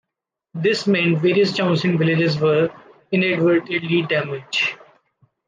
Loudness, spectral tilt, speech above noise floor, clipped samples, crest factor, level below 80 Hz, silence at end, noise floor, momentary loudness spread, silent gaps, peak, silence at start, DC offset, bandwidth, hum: -19 LUFS; -6.5 dB/octave; 65 dB; under 0.1%; 14 dB; -66 dBFS; 0.7 s; -83 dBFS; 6 LU; none; -6 dBFS; 0.55 s; under 0.1%; 9.4 kHz; none